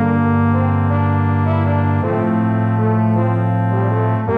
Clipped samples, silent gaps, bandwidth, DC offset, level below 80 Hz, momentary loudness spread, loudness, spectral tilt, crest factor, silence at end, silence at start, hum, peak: under 0.1%; none; 3.9 kHz; under 0.1%; -34 dBFS; 2 LU; -16 LUFS; -11 dB/octave; 10 dB; 0 s; 0 s; none; -4 dBFS